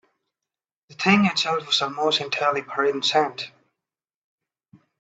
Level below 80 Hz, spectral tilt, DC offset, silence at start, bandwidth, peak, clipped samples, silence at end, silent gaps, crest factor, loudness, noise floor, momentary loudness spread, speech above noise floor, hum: -68 dBFS; -4 dB/octave; under 0.1%; 0.9 s; 8 kHz; -4 dBFS; under 0.1%; 1.5 s; none; 22 dB; -21 LUFS; -89 dBFS; 7 LU; 67 dB; none